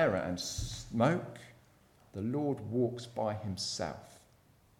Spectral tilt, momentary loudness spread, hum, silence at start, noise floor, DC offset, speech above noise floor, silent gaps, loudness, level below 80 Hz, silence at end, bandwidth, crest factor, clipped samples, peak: -5 dB/octave; 14 LU; none; 0 s; -65 dBFS; under 0.1%; 31 dB; none; -35 LUFS; -56 dBFS; 0.6 s; 16.5 kHz; 20 dB; under 0.1%; -16 dBFS